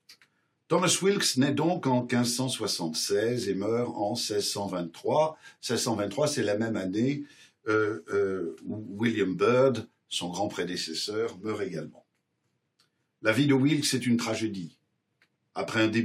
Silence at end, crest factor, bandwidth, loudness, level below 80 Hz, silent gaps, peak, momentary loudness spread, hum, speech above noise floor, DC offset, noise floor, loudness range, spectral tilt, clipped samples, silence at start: 0 s; 20 dB; 16 kHz; -28 LUFS; -80 dBFS; none; -8 dBFS; 12 LU; none; 50 dB; under 0.1%; -77 dBFS; 3 LU; -4.5 dB/octave; under 0.1%; 0.1 s